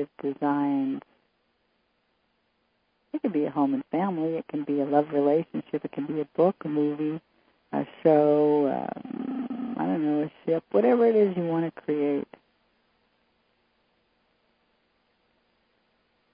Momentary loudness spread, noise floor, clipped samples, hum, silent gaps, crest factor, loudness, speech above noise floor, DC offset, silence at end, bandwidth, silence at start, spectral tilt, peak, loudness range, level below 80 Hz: 12 LU; -72 dBFS; under 0.1%; none; none; 20 dB; -26 LUFS; 47 dB; under 0.1%; 4.1 s; 5 kHz; 0 s; -11.5 dB/octave; -8 dBFS; 7 LU; -76 dBFS